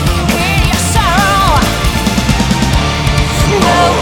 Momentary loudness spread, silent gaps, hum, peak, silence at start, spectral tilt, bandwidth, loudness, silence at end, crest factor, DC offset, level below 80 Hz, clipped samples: 3 LU; none; none; 0 dBFS; 0 s; -4.5 dB/octave; 19 kHz; -11 LUFS; 0 s; 10 dB; under 0.1%; -18 dBFS; under 0.1%